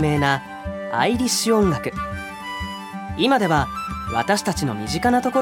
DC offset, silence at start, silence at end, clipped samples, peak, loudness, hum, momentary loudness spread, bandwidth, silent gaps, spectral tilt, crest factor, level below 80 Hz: under 0.1%; 0 s; 0 s; under 0.1%; -4 dBFS; -21 LUFS; none; 12 LU; 18 kHz; none; -4.5 dB/octave; 18 dB; -40 dBFS